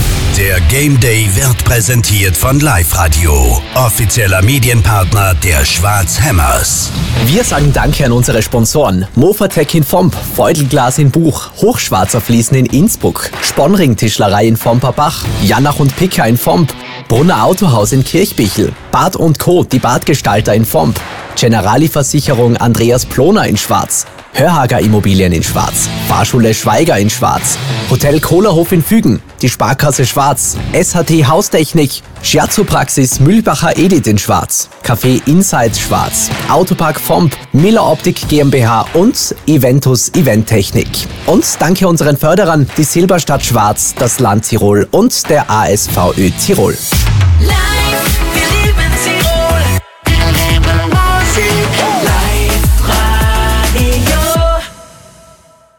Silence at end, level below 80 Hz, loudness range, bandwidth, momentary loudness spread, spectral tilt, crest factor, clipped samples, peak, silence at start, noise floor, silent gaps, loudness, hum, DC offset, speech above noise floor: 0.9 s; -20 dBFS; 1 LU; 18 kHz; 4 LU; -4.5 dB/octave; 10 dB; under 0.1%; 0 dBFS; 0 s; -42 dBFS; none; -10 LUFS; none; under 0.1%; 33 dB